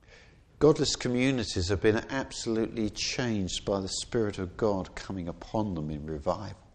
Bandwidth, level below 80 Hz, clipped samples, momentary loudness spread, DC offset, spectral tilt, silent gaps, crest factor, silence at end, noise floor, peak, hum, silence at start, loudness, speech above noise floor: 9.8 kHz; -48 dBFS; under 0.1%; 10 LU; under 0.1%; -5 dB/octave; none; 20 dB; 0.2 s; -55 dBFS; -10 dBFS; none; 0.1 s; -30 LUFS; 26 dB